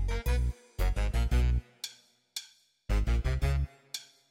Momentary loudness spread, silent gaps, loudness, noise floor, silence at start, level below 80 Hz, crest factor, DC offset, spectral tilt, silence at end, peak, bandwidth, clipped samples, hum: 13 LU; none; -33 LUFS; -56 dBFS; 0 s; -32 dBFS; 14 dB; under 0.1%; -5.5 dB/octave; 0.25 s; -16 dBFS; 16 kHz; under 0.1%; none